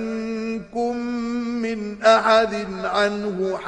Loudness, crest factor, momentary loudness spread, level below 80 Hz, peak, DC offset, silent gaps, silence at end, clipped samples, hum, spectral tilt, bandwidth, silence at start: -22 LUFS; 18 dB; 11 LU; -54 dBFS; -4 dBFS; under 0.1%; none; 0 s; under 0.1%; none; -4.5 dB/octave; 10 kHz; 0 s